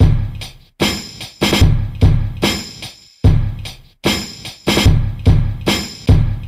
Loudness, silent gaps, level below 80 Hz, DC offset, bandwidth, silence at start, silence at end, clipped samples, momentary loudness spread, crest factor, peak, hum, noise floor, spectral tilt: -16 LUFS; none; -20 dBFS; under 0.1%; 15.5 kHz; 0 s; 0 s; under 0.1%; 16 LU; 14 dB; 0 dBFS; none; -35 dBFS; -5.5 dB/octave